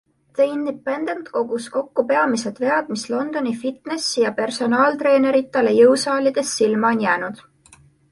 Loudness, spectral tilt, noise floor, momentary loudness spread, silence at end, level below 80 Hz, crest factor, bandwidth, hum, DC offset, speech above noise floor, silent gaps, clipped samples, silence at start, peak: -19 LUFS; -4 dB/octave; -52 dBFS; 10 LU; 0.75 s; -66 dBFS; 16 dB; 11.5 kHz; none; under 0.1%; 32 dB; none; under 0.1%; 0.35 s; -2 dBFS